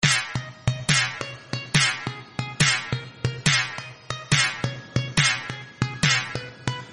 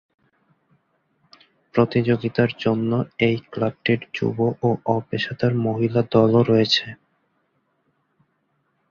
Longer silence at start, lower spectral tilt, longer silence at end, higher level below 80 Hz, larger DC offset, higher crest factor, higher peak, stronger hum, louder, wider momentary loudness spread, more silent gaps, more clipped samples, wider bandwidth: second, 0 s vs 1.75 s; second, -3 dB/octave vs -7 dB/octave; second, 0 s vs 1.95 s; first, -50 dBFS vs -58 dBFS; neither; about the same, 20 dB vs 20 dB; about the same, -4 dBFS vs -4 dBFS; neither; about the same, -23 LUFS vs -21 LUFS; first, 12 LU vs 7 LU; neither; neither; first, 11.5 kHz vs 7.2 kHz